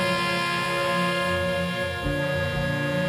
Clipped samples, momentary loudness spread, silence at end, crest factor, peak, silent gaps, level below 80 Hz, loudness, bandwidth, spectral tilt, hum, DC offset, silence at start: under 0.1%; 3 LU; 0 s; 14 dB; -12 dBFS; none; -44 dBFS; -25 LUFS; 15.5 kHz; -5 dB/octave; 60 Hz at -50 dBFS; under 0.1%; 0 s